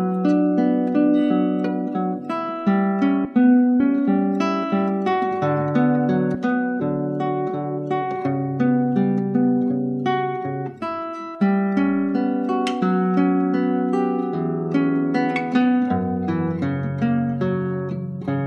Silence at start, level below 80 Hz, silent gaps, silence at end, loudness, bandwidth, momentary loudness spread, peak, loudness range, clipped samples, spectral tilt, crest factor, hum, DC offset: 0 s; -64 dBFS; none; 0 s; -21 LUFS; 8.4 kHz; 7 LU; -6 dBFS; 3 LU; under 0.1%; -8.5 dB/octave; 14 dB; none; under 0.1%